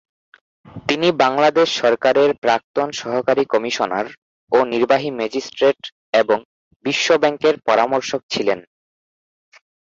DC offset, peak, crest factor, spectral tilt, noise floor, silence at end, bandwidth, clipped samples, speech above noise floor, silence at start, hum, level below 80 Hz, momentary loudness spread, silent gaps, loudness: under 0.1%; -2 dBFS; 18 dB; -4 dB/octave; under -90 dBFS; 1.3 s; 7.8 kHz; under 0.1%; over 73 dB; 0.75 s; none; -62 dBFS; 8 LU; 2.38-2.42 s, 2.64-2.74 s, 4.17-4.47 s, 5.92-6.13 s, 6.45-6.80 s, 8.23-8.29 s; -18 LUFS